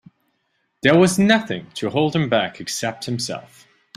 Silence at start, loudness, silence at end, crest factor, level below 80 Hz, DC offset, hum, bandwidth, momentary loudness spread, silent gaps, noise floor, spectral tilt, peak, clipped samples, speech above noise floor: 0.85 s; -19 LUFS; 0.55 s; 20 dB; -56 dBFS; under 0.1%; none; 15 kHz; 12 LU; none; -70 dBFS; -5 dB/octave; -2 dBFS; under 0.1%; 51 dB